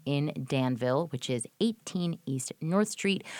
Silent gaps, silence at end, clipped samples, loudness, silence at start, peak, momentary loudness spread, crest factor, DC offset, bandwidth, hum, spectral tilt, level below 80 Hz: none; 0 s; under 0.1%; -31 LUFS; 0.05 s; -12 dBFS; 5 LU; 18 dB; under 0.1%; 18.5 kHz; none; -5.5 dB/octave; -72 dBFS